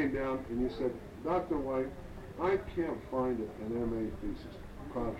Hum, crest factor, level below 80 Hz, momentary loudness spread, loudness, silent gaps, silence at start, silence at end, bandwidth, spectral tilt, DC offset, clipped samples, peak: none; 16 dB; -48 dBFS; 10 LU; -36 LUFS; none; 0 s; 0 s; 15.5 kHz; -8 dB/octave; under 0.1%; under 0.1%; -20 dBFS